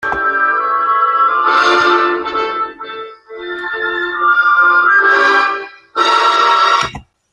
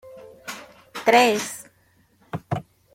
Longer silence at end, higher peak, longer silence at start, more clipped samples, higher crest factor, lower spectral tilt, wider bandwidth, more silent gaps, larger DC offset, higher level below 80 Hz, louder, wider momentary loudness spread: about the same, 0.3 s vs 0.35 s; about the same, 0 dBFS vs -2 dBFS; about the same, 0 s vs 0.05 s; neither; second, 12 dB vs 22 dB; about the same, -2.5 dB/octave vs -3.5 dB/octave; second, 10 kHz vs 16.5 kHz; neither; neither; first, -50 dBFS vs -64 dBFS; first, -12 LUFS vs -21 LUFS; second, 14 LU vs 22 LU